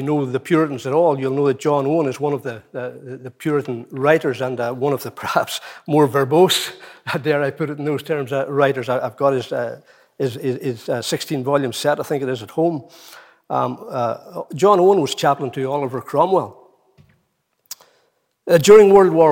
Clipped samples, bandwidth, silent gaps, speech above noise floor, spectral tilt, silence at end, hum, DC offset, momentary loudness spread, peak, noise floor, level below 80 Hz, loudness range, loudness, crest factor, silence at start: under 0.1%; 17 kHz; none; 50 dB; -5.5 dB/octave; 0 s; none; under 0.1%; 15 LU; -2 dBFS; -68 dBFS; -62 dBFS; 4 LU; -18 LUFS; 18 dB; 0 s